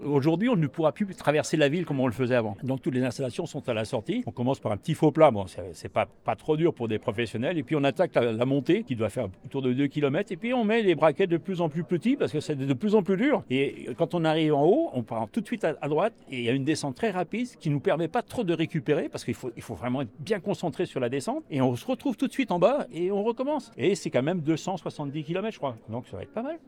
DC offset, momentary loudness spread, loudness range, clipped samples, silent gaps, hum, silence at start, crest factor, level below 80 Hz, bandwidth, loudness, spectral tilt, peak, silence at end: under 0.1%; 9 LU; 4 LU; under 0.1%; none; none; 0 s; 20 dB; -64 dBFS; 15.5 kHz; -27 LUFS; -6.5 dB/octave; -6 dBFS; 0.1 s